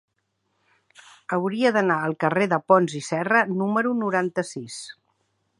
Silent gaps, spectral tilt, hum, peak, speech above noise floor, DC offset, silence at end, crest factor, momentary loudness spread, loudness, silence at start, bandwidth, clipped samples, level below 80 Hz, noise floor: none; -5.5 dB/octave; none; -4 dBFS; 51 dB; under 0.1%; 0.65 s; 20 dB; 15 LU; -22 LUFS; 1.3 s; 11.5 kHz; under 0.1%; -74 dBFS; -74 dBFS